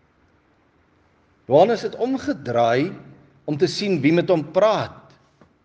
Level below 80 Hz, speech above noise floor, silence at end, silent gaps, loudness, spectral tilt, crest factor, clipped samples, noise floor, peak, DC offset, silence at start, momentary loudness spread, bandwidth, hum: -64 dBFS; 41 dB; 0.65 s; none; -20 LUFS; -6.5 dB/octave; 18 dB; under 0.1%; -60 dBFS; -4 dBFS; under 0.1%; 1.5 s; 12 LU; 9.2 kHz; none